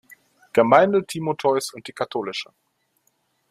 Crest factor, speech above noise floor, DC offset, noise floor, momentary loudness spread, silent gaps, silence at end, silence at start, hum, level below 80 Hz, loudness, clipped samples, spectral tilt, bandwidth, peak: 20 dB; 48 dB; under 0.1%; -69 dBFS; 16 LU; none; 1.05 s; 0.55 s; none; -66 dBFS; -21 LUFS; under 0.1%; -5 dB/octave; 15 kHz; -2 dBFS